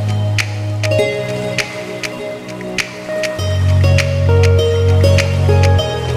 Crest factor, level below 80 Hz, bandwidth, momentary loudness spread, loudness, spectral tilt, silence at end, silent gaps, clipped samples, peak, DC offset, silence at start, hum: 14 dB; -34 dBFS; 13.5 kHz; 11 LU; -15 LUFS; -5.5 dB/octave; 0 s; none; under 0.1%; 0 dBFS; under 0.1%; 0 s; none